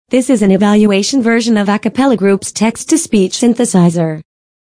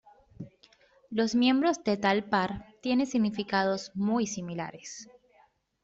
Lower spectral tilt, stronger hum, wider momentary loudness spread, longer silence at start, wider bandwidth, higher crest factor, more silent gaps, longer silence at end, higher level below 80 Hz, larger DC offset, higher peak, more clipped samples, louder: about the same, -5 dB/octave vs -5 dB/octave; neither; second, 6 LU vs 19 LU; second, 0.1 s vs 0.4 s; first, 10.5 kHz vs 8 kHz; second, 10 dB vs 20 dB; neither; second, 0.45 s vs 0.8 s; first, -48 dBFS vs -64 dBFS; neither; first, 0 dBFS vs -10 dBFS; neither; first, -12 LUFS vs -29 LUFS